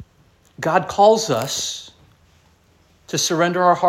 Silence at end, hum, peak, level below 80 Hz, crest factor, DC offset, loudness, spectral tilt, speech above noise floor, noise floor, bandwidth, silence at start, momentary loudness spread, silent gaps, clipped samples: 0 s; none; -2 dBFS; -58 dBFS; 20 dB; under 0.1%; -18 LUFS; -3.5 dB/octave; 39 dB; -56 dBFS; 16.5 kHz; 0 s; 12 LU; none; under 0.1%